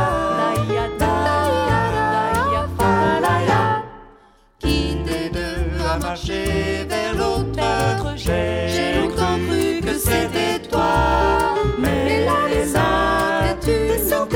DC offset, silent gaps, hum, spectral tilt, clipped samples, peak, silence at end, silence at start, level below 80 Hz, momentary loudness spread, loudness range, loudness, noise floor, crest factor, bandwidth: under 0.1%; none; none; -5 dB/octave; under 0.1%; -4 dBFS; 0 s; 0 s; -30 dBFS; 6 LU; 4 LU; -19 LUFS; -51 dBFS; 16 dB; 17.5 kHz